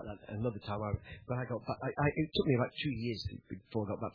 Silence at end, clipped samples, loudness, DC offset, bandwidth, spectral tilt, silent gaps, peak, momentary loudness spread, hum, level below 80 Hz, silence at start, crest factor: 0.05 s; under 0.1%; -36 LUFS; under 0.1%; 5.4 kHz; -5.5 dB/octave; none; -16 dBFS; 10 LU; none; -56 dBFS; 0 s; 20 dB